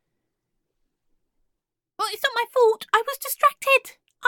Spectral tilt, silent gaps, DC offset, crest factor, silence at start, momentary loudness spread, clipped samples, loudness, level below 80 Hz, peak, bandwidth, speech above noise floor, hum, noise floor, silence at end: 1 dB/octave; none; under 0.1%; 22 dB; 2 s; 9 LU; under 0.1%; -22 LUFS; -76 dBFS; -4 dBFS; 17.5 kHz; 60 dB; none; -81 dBFS; 0 s